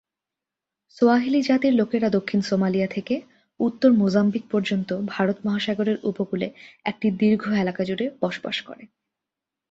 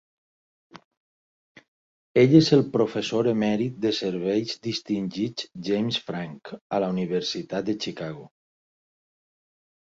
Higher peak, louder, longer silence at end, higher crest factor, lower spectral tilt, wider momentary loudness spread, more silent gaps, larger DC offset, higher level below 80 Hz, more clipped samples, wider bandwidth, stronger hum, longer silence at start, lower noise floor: about the same, -6 dBFS vs -4 dBFS; about the same, -23 LUFS vs -24 LUFS; second, 0.85 s vs 1.7 s; about the same, 18 dB vs 22 dB; about the same, -7 dB/octave vs -6 dB/octave; second, 10 LU vs 16 LU; second, none vs 0.85-0.91 s, 0.97-1.55 s, 1.68-2.15 s, 6.61-6.70 s; neither; about the same, -64 dBFS vs -64 dBFS; neither; about the same, 7.8 kHz vs 7.8 kHz; neither; first, 1 s vs 0.75 s; about the same, -87 dBFS vs under -90 dBFS